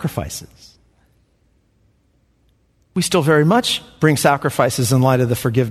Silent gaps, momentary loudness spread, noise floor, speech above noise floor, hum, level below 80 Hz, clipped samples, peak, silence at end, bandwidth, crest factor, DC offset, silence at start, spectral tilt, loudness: none; 12 LU; -60 dBFS; 43 dB; none; -48 dBFS; under 0.1%; 0 dBFS; 0 s; 14 kHz; 18 dB; under 0.1%; 0 s; -5 dB/octave; -17 LUFS